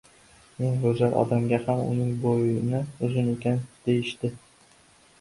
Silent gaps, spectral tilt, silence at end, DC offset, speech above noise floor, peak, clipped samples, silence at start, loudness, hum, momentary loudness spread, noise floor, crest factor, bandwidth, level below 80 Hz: none; -8 dB/octave; 0.85 s; under 0.1%; 33 dB; -8 dBFS; under 0.1%; 0.6 s; -26 LUFS; none; 6 LU; -57 dBFS; 18 dB; 11.5 kHz; -58 dBFS